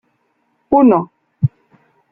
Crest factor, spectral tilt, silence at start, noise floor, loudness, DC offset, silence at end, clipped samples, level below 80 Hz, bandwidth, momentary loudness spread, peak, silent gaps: 16 dB; -13 dB/octave; 0.7 s; -64 dBFS; -15 LUFS; under 0.1%; 0.65 s; under 0.1%; -52 dBFS; 3 kHz; 10 LU; -2 dBFS; none